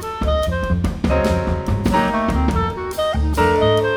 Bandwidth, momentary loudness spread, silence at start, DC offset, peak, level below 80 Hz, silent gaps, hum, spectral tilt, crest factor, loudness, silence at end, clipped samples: 19.5 kHz; 5 LU; 0 s; under 0.1%; -4 dBFS; -24 dBFS; none; none; -6.5 dB/octave; 14 dB; -19 LUFS; 0 s; under 0.1%